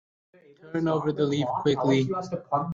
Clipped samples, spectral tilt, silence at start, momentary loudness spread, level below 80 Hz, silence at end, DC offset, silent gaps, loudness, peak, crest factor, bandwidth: under 0.1%; -7 dB/octave; 0.65 s; 6 LU; -64 dBFS; 0 s; under 0.1%; none; -26 LUFS; -10 dBFS; 18 dB; 7.6 kHz